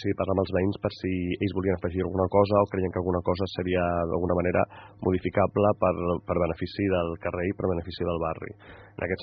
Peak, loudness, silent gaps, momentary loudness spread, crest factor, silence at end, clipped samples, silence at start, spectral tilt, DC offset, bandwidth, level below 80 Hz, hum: -6 dBFS; -27 LUFS; none; 8 LU; 20 dB; 0 s; under 0.1%; 0 s; -6.5 dB/octave; under 0.1%; 6.2 kHz; -54 dBFS; none